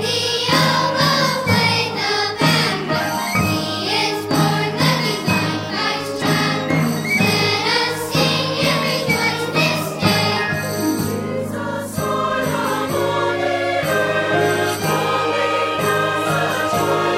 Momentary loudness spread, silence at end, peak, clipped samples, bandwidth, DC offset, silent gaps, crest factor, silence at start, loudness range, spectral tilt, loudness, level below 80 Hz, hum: 5 LU; 0 s; -2 dBFS; under 0.1%; 16 kHz; under 0.1%; none; 16 dB; 0 s; 3 LU; -4 dB/octave; -18 LUFS; -54 dBFS; none